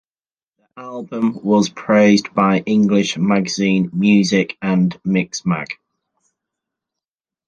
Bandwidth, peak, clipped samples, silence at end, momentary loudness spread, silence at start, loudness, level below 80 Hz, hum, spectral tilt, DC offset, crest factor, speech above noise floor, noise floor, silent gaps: 8.8 kHz; -2 dBFS; under 0.1%; 1.75 s; 13 LU; 0.75 s; -16 LUFS; -58 dBFS; none; -6 dB/octave; under 0.1%; 16 dB; over 74 dB; under -90 dBFS; none